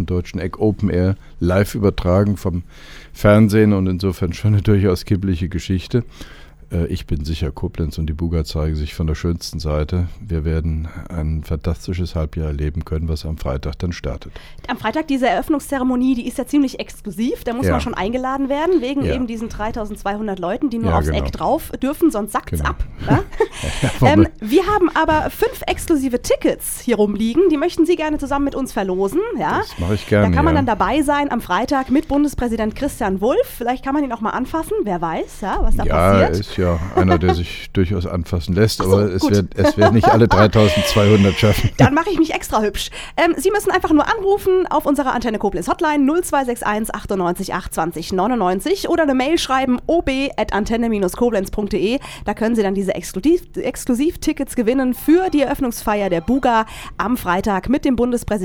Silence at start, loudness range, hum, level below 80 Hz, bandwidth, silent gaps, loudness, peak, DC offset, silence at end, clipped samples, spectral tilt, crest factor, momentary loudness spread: 0 s; 7 LU; none; -30 dBFS; 19 kHz; none; -18 LUFS; 0 dBFS; under 0.1%; 0 s; under 0.1%; -6 dB/octave; 18 dB; 10 LU